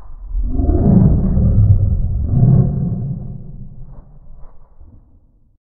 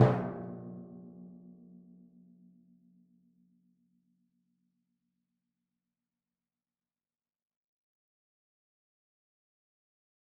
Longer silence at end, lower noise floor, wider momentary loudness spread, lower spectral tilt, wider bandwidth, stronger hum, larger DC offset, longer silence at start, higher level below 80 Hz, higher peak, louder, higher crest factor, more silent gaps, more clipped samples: second, 0.8 s vs 8.7 s; second, -49 dBFS vs under -90 dBFS; second, 20 LU vs 24 LU; first, -16 dB/octave vs -7 dB/octave; second, 1.8 kHz vs 2.8 kHz; neither; neither; about the same, 0 s vs 0 s; first, -20 dBFS vs -70 dBFS; first, 0 dBFS vs -10 dBFS; first, -15 LUFS vs -36 LUFS; second, 16 dB vs 30 dB; neither; neither